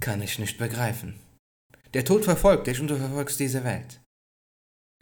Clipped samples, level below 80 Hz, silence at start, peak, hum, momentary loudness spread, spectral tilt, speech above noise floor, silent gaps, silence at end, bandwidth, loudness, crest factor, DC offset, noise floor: under 0.1%; -44 dBFS; 0 s; -6 dBFS; none; 14 LU; -5 dB/octave; over 65 dB; 1.39-1.70 s; 1.05 s; over 20 kHz; -26 LUFS; 20 dB; under 0.1%; under -90 dBFS